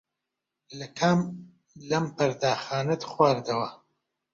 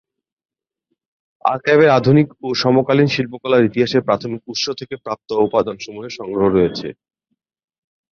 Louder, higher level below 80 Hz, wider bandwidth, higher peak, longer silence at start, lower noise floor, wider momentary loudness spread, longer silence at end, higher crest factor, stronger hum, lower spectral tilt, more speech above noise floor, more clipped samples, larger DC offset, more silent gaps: second, -27 LUFS vs -17 LUFS; second, -66 dBFS vs -52 dBFS; about the same, 7.6 kHz vs 7.2 kHz; second, -6 dBFS vs -2 dBFS; second, 0.7 s vs 1.45 s; first, -85 dBFS vs -74 dBFS; about the same, 16 LU vs 15 LU; second, 0.55 s vs 1.2 s; first, 22 dB vs 16 dB; neither; about the same, -5.5 dB/octave vs -6 dB/octave; about the same, 59 dB vs 58 dB; neither; neither; neither